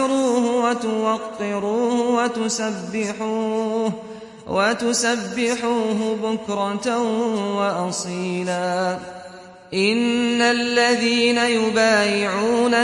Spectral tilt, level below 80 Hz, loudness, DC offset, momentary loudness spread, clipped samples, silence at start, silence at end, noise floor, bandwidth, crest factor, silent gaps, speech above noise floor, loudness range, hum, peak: -3.5 dB/octave; -62 dBFS; -20 LUFS; under 0.1%; 8 LU; under 0.1%; 0 s; 0 s; -41 dBFS; 11.5 kHz; 16 dB; none; 20 dB; 5 LU; none; -6 dBFS